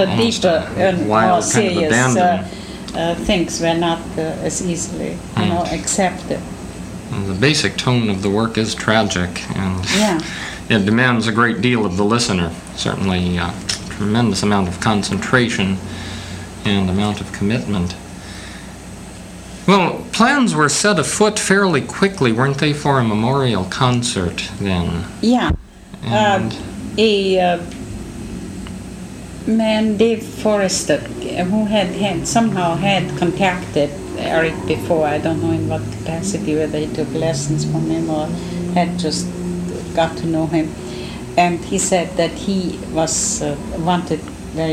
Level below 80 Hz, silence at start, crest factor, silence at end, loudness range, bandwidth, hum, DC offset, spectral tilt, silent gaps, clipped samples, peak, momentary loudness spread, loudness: -40 dBFS; 0 s; 18 dB; 0 s; 4 LU; 15.5 kHz; none; under 0.1%; -4.5 dB/octave; none; under 0.1%; 0 dBFS; 13 LU; -18 LUFS